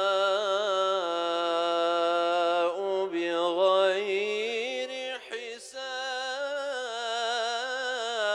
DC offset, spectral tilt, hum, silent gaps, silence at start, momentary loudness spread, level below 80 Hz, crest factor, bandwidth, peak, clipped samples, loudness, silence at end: under 0.1%; -2 dB/octave; none; none; 0 s; 9 LU; -80 dBFS; 16 dB; 11 kHz; -12 dBFS; under 0.1%; -28 LUFS; 0 s